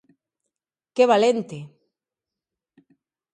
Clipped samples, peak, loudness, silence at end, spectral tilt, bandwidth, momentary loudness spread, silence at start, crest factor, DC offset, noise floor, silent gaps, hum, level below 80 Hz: under 0.1%; -4 dBFS; -20 LUFS; 1.65 s; -5 dB/octave; 9.4 kHz; 20 LU; 0.95 s; 22 dB; under 0.1%; -89 dBFS; none; none; -78 dBFS